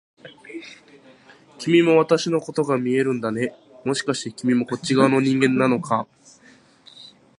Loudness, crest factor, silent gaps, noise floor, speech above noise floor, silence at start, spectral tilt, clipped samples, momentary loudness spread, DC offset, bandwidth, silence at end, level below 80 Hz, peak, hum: -21 LUFS; 20 dB; none; -53 dBFS; 33 dB; 0.25 s; -5.5 dB/octave; under 0.1%; 19 LU; under 0.1%; 11.5 kHz; 0.3 s; -68 dBFS; -2 dBFS; none